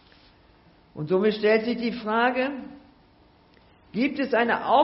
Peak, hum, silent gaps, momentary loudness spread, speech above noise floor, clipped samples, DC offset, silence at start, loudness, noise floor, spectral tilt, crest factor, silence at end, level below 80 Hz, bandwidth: -8 dBFS; none; none; 16 LU; 34 dB; under 0.1%; under 0.1%; 0.95 s; -24 LUFS; -57 dBFS; -3.5 dB/octave; 18 dB; 0 s; -62 dBFS; 5.8 kHz